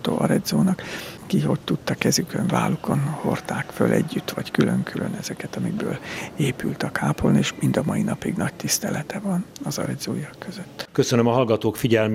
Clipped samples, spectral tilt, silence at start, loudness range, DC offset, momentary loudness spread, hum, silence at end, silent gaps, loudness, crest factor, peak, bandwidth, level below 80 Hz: under 0.1%; -5.5 dB/octave; 0 s; 2 LU; under 0.1%; 9 LU; none; 0 s; none; -23 LUFS; 22 dB; -2 dBFS; 16 kHz; -52 dBFS